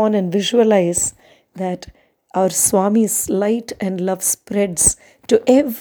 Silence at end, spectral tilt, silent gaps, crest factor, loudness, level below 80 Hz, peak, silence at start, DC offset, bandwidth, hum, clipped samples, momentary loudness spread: 0 s; -4 dB/octave; none; 18 dB; -17 LUFS; -46 dBFS; 0 dBFS; 0 s; under 0.1%; over 20 kHz; none; under 0.1%; 11 LU